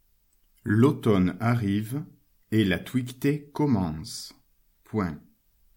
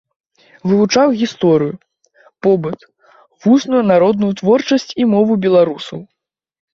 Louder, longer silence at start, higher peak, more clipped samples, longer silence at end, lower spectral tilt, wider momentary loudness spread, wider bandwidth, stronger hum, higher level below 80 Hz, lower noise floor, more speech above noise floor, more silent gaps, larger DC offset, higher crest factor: second, -26 LUFS vs -14 LUFS; about the same, 0.65 s vs 0.65 s; second, -6 dBFS vs -2 dBFS; neither; second, 0.55 s vs 0.7 s; about the same, -7 dB/octave vs -6 dB/octave; about the same, 15 LU vs 13 LU; first, 17 kHz vs 7.4 kHz; neither; about the same, -56 dBFS vs -58 dBFS; first, -65 dBFS vs -52 dBFS; about the same, 40 dB vs 39 dB; neither; neither; first, 20 dB vs 14 dB